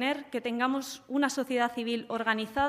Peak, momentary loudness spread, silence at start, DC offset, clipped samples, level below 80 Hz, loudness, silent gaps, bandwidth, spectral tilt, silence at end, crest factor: -12 dBFS; 5 LU; 0 s; under 0.1%; under 0.1%; -62 dBFS; -30 LUFS; none; 15.5 kHz; -3.5 dB/octave; 0 s; 18 dB